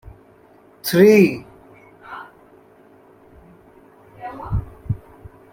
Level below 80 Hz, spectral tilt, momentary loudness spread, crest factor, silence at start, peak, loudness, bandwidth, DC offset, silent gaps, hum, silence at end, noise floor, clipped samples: -42 dBFS; -6.5 dB/octave; 25 LU; 20 dB; 0.85 s; -2 dBFS; -17 LUFS; 16.5 kHz; under 0.1%; none; none; 0.55 s; -50 dBFS; under 0.1%